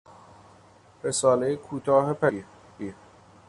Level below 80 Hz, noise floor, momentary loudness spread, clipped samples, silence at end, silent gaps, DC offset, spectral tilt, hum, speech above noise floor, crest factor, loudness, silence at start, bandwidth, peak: -64 dBFS; -55 dBFS; 17 LU; under 0.1%; 0.55 s; none; under 0.1%; -4.5 dB/octave; none; 30 dB; 20 dB; -25 LUFS; 1.05 s; 11.5 kHz; -8 dBFS